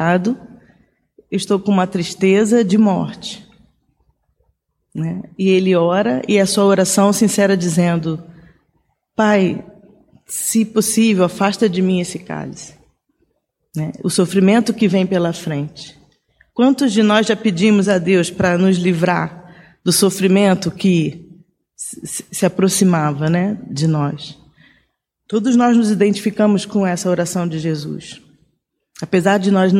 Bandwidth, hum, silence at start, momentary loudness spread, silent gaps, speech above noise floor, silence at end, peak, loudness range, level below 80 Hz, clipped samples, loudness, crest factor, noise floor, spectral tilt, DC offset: 16.5 kHz; none; 0 s; 14 LU; none; 53 dB; 0 s; -2 dBFS; 4 LU; -56 dBFS; under 0.1%; -16 LUFS; 16 dB; -69 dBFS; -5.5 dB/octave; under 0.1%